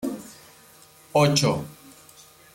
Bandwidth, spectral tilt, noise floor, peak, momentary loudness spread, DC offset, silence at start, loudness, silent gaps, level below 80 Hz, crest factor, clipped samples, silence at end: 16.5 kHz; -4.5 dB/octave; -52 dBFS; -8 dBFS; 22 LU; under 0.1%; 0 s; -22 LUFS; none; -60 dBFS; 18 dB; under 0.1%; 0.8 s